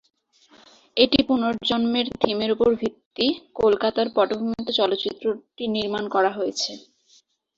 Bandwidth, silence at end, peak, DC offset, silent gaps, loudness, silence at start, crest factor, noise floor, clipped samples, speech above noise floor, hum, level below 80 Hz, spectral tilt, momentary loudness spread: 8 kHz; 0.8 s; -2 dBFS; under 0.1%; 3.06-3.11 s; -23 LUFS; 0.95 s; 22 dB; -60 dBFS; under 0.1%; 37 dB; none; -56 dBFS; -4.5 dB/octave; 8 LU